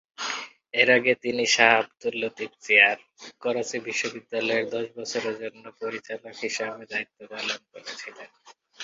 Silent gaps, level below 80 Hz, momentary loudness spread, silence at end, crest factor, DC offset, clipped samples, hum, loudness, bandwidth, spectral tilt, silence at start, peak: none; -74 dBFS; 18 LU; 0 s; 26 dB; under 0.1%; under 0.1%; none; -24 LUFS; 7.8 kHz; -2 dB/octave; 0.2 s; -2 dBFS